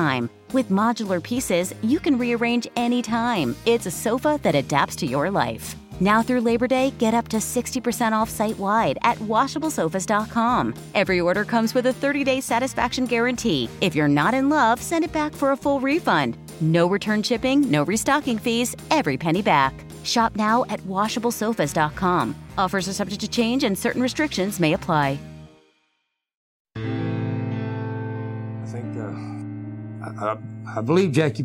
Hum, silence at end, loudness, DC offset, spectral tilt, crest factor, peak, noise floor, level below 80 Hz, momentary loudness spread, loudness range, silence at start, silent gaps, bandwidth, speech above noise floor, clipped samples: none; 0 s; -22 LUFS; under 0.1%; -5 dB/octave; 18 dB; -4 dBFS; -74 dBFS; -50 dBFS; 10 LU; 8 LU; 0 s; 26.36-26.65 s; 17 kHz; 53 dB; under 0.1%